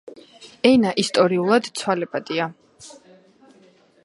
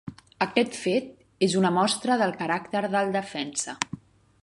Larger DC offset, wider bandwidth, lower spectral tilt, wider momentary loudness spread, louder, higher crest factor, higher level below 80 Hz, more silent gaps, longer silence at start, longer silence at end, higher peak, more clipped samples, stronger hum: neither; about the same, 11.5 kHz vs 11.5 kHz; about the same, -4.5 dB/octave vs -4 dB/octave; about the same, 9 LU vs 10 LU; first, -20 LUFS vs -26 LUFS; about the same, 22 dB vs 22 dB; about the same, -62 dBFS vs -66 dBFS; neither; about the same, 0.05 s vs 0.05 s; first, 1.15 s vs 0.45 s; about the same, -2 dBFS vs -4 dBFS; neither; neither